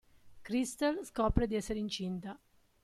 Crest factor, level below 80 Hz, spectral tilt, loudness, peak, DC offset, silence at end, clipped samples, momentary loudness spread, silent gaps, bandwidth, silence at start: 24 dB; -46 dBFS; -5.5 dB/octave; -35 LUFS; -12 dBFS; under 0.1%; 0.45 s; under 0.1%; 15 LU; none; 14 kHz; 0.25 s